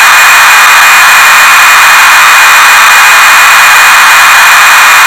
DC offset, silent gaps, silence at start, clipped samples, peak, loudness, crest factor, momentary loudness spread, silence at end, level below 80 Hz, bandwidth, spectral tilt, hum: 1%; none; 0 s; 20%; 0 dBFS; 1 LUFS; 2 dB; 0 LU; 0 s; -42 dBFS; 16 kHz; 2.5 dB/octave; none